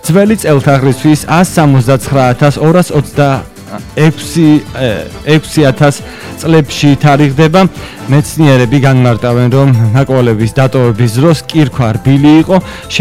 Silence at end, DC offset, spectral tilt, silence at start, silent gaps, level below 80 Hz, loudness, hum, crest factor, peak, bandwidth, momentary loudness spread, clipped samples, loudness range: 0 s; under 0.1%; -6.5 dB/octave; 0.05 s; none; -34 dBFS; -9 LUFS; none; 8 dB; 0 dBFS; 15.5 kHz; 6 LU; 0.3%; 2 LU